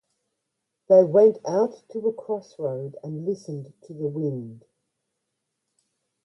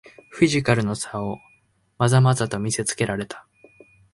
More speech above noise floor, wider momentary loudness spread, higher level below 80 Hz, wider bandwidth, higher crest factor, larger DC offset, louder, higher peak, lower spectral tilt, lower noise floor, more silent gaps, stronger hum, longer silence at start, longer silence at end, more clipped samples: first, 58 dB vs 31 dB; about the same, 19 LU vs 17 LU; second, -76 dBFS vs -52 dBFS; second, 6.2 kHz vs 11.5 kHz; about the same, 20 dB vs 20 dB; neither; about the same, -23 LUFS vs -22 LUFS; about the same, -6 dBFS vs -4 dBFS; first, -8.5 dB/octave vs -5.5 dB/octave; first, -81 dBFS vs -52 dBFS; neither; neither; first, 0.9 s vs 0.3 s; first, 1.7 s vs 0.75 s; neither